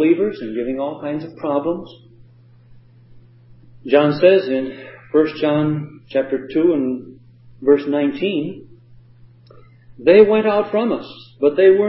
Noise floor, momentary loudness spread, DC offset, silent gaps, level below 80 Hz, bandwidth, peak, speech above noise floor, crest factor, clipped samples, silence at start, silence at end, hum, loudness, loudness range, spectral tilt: -47 dBFS; 14 LU; under 0.1%; none; -58 dBFS; 5.8 kHz; 0 dBFS; 31 dB; 18 dB; under 0.1%; 0 s; 0 s; none; -18 LUFS; 6 LU; -11.5 dB/octave